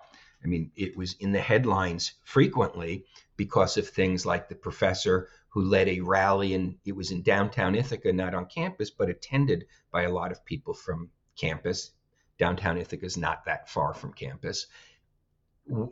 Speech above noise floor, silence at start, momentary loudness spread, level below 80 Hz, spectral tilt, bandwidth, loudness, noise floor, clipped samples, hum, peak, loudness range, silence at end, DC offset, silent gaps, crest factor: 44 dB; 0.45 s; 12 LU; -56 dBFS; -5.5 dB/octave; 8 kHz; -28 LUFS; -72 dBFS; under 0.1%; none; -10 dBFS; 5 LU; 0 s; under 0.1%; none; 18 dB